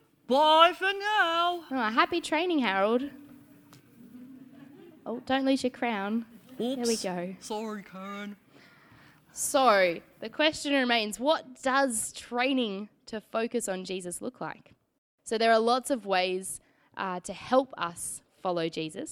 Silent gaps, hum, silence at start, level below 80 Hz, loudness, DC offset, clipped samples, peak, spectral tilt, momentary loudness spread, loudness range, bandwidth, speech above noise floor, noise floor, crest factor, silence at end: 14.98-15.18 s; none; 0.3 s; -68 dBFS; -28 LUFS; under 0.1%; under 0.1%; -6 dBFS; -3 dB/octave; 17 LU; 7 LU; 20 kHz; 29 dB; -57 dBFS; 24 dB; 0 s